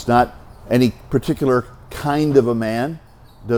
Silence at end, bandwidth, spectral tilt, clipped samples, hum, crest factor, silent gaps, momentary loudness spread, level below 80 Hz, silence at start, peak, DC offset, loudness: 0 s; 20 kHz; -7 dB/octave; under 0.1%; none; 18 dB; none; 12 LU; -42 dBFS; 0 s; -2 dBFS; under 0.1%; -19 LUFS